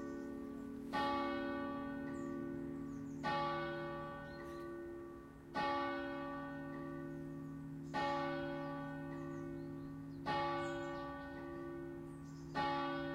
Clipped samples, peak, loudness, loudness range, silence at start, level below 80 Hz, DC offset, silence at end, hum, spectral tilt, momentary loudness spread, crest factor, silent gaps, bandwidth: under 0.1%; -26 dBFS; -43 LUFS; 2 LU; 0 s; -64 dBFS; under 0.1%; 0 s; none; -6.5 dB/octave; 10 LU; 16 dB; none; 15.5 kHz